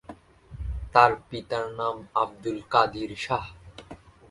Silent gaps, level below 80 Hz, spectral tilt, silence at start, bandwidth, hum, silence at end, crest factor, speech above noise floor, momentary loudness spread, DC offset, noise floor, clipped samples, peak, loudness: none; -44 dBFS; -5.5 dB/octave; 0.1 s; 11.5 kHz; none; 0.35 s; 26 dB; 22 dB; 19 LU; under 0.1%; -48 dBFS; under 0.1%; -2 dBFS; -26 LUFS